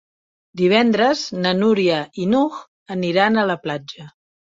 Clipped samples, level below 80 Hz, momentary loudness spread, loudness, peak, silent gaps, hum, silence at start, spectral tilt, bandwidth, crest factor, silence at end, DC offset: under 0.1%; -62 dBFS; 16 LU; -18 LUFS; -2 dBFS; 2.68-2.86 s; none; 0.55 s; -5.5 dB/octave; 7.8 kHz; 18 dB; 0.45 s; under 0.1%